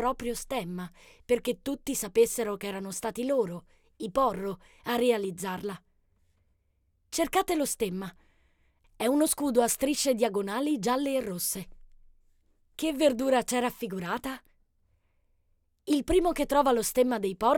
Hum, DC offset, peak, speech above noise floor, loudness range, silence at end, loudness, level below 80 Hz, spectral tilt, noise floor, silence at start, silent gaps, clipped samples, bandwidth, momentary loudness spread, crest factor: none; under 0.1%; -10 dBFS; 44 dB; 4 LU; 0 s; -29 LUFS; -52 dBFS; -4 dB/octave; -72 dBFS; 0 s; none; under 0.1%; 19 kHz; 13 LU; 18 dB